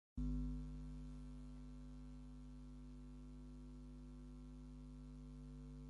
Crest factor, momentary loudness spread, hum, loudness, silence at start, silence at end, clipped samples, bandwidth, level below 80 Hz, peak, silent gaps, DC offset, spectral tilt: 16 dB; 11 LU; 50 Hz at -55 dBFS; -54 LUFS; 0.15 s; 0 s; under 0.1%; 11 kHz; -54 dBFS; -34 dBFS; none; under 0.1%; -8 dB/octave